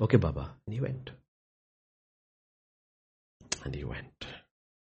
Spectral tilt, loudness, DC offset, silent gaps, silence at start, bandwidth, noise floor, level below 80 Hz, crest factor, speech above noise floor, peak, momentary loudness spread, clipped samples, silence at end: -6 dB/octave; -35 LUFS; under 0.1%; 1.28-3.40 s; 0 s; 8.2 kHz; under -90 dBFS; -50 dBFS; 26 dB; over 59 dB; -8 dBFS; 17 LU; under 0.1%; 0.45 s